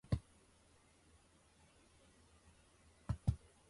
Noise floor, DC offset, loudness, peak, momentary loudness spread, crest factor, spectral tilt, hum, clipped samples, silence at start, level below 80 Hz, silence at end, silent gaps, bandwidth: -70 dBFS; under 0.1%; -44 LUFS; -22 dBFS; 27 LU; 26 dB; -7.5 dB/octave; none; under 0.1%; 0.1 s; -54 dBFS; 0.35 s; none; 11.5 kHz